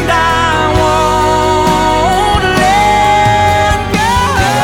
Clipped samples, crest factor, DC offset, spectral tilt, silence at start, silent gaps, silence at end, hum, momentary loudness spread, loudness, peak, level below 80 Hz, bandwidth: under 0.1%; 10 dB; under 0.1%; -4.5 dB/octave; 0 s; none; 0 s; none; 2 LU; -10 LUFS; 0 dBFS; -24 dBFS; 18.5 kHz